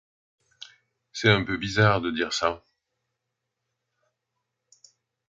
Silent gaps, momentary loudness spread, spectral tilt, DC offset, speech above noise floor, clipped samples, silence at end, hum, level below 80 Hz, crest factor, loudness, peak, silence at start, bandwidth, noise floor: none; 25 LU; -5 dB/octave; under 0.1%; 59 dB; under 0.1%; 2.7 s; none; -54 dBFS; 24 dB; -24 LUFS; -4 dBFS; 0.6 s; 7.8 kHz; -82 dBFS